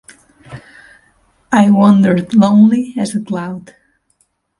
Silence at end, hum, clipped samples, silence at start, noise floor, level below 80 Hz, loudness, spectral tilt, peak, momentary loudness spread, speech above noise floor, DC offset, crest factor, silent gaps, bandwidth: 1 s; none; under 0.1%; 0.5 s; -61 dBFS; -54 dBFS; -12 LUFS; -7.5 dB/octave; 0 dBFS; 14 LU; 50 dB; under 0.1%; 14 dB; none; 11.5 kHz